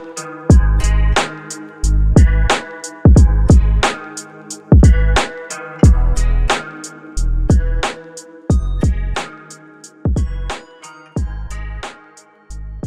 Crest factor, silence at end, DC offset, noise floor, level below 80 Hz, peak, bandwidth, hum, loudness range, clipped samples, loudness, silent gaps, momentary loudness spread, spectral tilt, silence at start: 14 dB; 0 s; under 0.1%; -45 dBFS; -16 dBFS; 0 dBFS; 11 kHz; none; 10 LU; under 0.1%; -15 LUFS; none; 19 LU; -6 dB/octave; 0 s